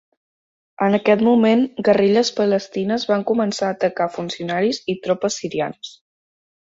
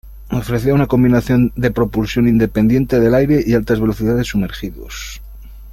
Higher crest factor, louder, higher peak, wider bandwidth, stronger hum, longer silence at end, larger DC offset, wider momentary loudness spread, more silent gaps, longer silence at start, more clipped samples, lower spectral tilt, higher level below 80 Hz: about the same, 18 dB vs 14 dB; second, -19 LUFS vs -15 LUFS; about the same, -2 dBFS vs -2 dBFS; second, 8 kHz vs 16 kHz; neither; first, 0.85 s vs 0 s; neither; second, 10 LU vs 15 LU; neither; first, 0.8 s vs 0.05 s; neither; second, -5 dB/octave vs -7.5 dB/octave; second, -62 dBFS vs -32 dBFS